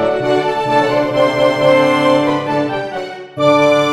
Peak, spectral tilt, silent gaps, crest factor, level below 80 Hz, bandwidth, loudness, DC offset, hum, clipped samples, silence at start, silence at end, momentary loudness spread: 0 dBFS; -5.5 dB/octave; none; 14 dB; -50 dBFS; 13.5 kHz; -14 LUFS; under 0.1%; none; under 0.1%; 0 s; 0 s; 9 LU